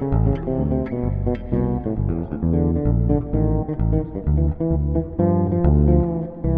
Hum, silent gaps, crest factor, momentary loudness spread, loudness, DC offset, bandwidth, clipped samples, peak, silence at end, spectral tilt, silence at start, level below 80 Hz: none; none; 16 dB; 6 LU; -21 LUFS; under 0.1%; 3.3 kHz; under 0.1%; -4 dBFS; 0 s; -13.5 dB/octave; 0 s; -26 dBFS